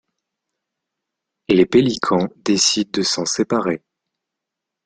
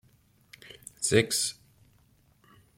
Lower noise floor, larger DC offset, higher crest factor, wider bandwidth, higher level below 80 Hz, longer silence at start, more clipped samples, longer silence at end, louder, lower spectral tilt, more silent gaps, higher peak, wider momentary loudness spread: first, -83 dBFS vs -64 dBFS; neither; second, 20 dB vs 26 dB; second, 9.4 kHz vs 16.5 kHz; first, -56 dBFS vs -64 dBFS; first, 1.5 s vs 0.65 s; neither; second, 1.1 s vs 1.25 s; first, -18 LUFS vs -27 LUFS; about the same, -3.5 dB/octave vs -3 dB/octave; neither; first, -2 dBFS vs -8 dBFS; second, 6 LU vs 23 LU